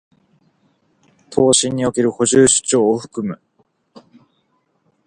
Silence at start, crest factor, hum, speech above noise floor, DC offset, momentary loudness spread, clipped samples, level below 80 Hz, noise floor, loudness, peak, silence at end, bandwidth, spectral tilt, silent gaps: 1.3 s; 20 dB; none; 49 dB; under 0.1%; 14 LU; under 0.1%; -54 dBFS; -65 dBFS; -15 LUFS; 0 dBFS; 1.7 s; 11 kHz; -3.5 dB/octave; none